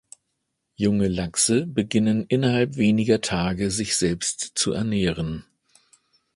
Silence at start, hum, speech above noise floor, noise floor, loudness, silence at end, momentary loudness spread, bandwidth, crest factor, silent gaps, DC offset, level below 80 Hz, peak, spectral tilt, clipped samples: 0.8 s; none; 55 dB; -77 dBFS; -23 LUFS; 0.95 s; 5 LU; 11.5 kHz; 18 dB; none; under 0.1%; -46 dBFS; -6 dBFS; -4.5 dB/octave; under 0.1%